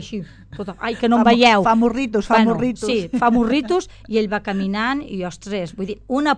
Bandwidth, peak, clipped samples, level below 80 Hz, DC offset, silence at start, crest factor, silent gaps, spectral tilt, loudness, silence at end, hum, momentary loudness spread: 9.8 kHz; 0 dBFS; under 0.1%; -44 dBFS; under 0.1%; 0 s; 18 dB; none; -5.5 dB/octave; -18 LUFS; 0 s; none; 15 LU